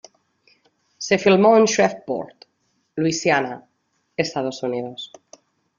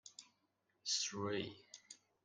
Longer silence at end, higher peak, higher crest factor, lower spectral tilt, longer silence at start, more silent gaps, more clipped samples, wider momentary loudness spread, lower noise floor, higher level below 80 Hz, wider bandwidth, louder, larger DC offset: first, 0.75 s vs 0.3 s; first, -4 dBFS vs -26 dBFS; about the same, 18 dB vs 20 dB; first, -4.5 dB/octave vs -2.5 dB/octave; first, 1 s vs 0.05 s; neither; neither; about the same, 20 LU vs 20 LU; second, -70 dBFS vs -83 dBFS; first, -64 dBFS vs -84 dBFS; second, 7.4 kHz vs 11 kHz; first, -20 LUFS vs -41 LUFS; neither